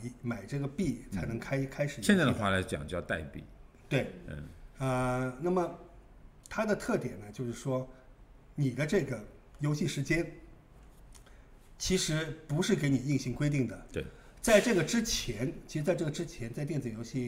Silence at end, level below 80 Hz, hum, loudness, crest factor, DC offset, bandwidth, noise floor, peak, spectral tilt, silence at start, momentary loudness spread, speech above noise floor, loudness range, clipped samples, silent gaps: 0 s; -52 dBFS; none; -32 LUFS; 22 dB; under 0.1%; 16 kHz; -55 dBFS; -10 dBFS; -5 dB/octave; 0 s; 13 LU; 23 dB; 5 LU; under 0.1%; none